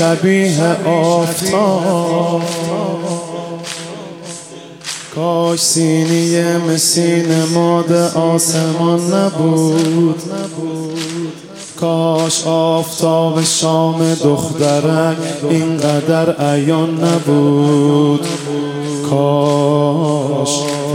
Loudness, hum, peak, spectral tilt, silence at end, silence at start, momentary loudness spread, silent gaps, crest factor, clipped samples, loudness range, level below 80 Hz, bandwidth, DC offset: -14 LUFS; none; 0 dBFS; -5 dB/octave; 0 s; 0 s; 11 LU; none; 14 dB; under 0.1%; 4 LU; -60 dBFS; 16.5 kHz; under 0.1%